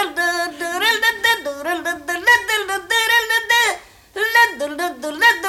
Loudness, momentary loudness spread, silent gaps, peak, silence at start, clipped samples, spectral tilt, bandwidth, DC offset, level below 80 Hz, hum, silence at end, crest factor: -17 LUFS; 10 LU; none; -4 dBFS; 0 s; under 0.1%; 0 dB/octave; 17 kHz; under 0.1%; -56 dBFS; none; 0 s; 16 dB